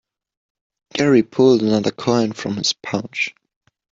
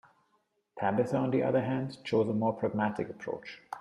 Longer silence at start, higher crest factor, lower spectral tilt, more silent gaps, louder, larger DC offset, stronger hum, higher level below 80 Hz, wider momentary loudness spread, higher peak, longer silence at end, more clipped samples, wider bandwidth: first, 0.95 s vs 0.75 s; about the same, 16 dB vs 16 dB; second, -5 dB/octave vs -8 dB/octave; neither; first, -18 LUFS vs -31 LUFS; neither; neither; first, -58 dBFS vs -70 dBFS; about the same, 10 LU vs 11 LU; first, -2 dBFS vs -14 dBFS; first, 0.6 s vs 0 s; neither; second, 7.8 kHz vs 11 kHz